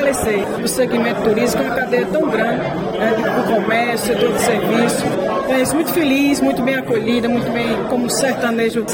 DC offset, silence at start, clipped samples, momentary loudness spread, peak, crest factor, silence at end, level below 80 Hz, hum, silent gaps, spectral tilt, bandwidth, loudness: under 0.1%; 0 s; under 0.1%; 3 LU; -4 dBFS; 14 dB; 0 s; -44 dBFS; none; none; -4.5 dB/octave; 17 kHz; -17 LUFS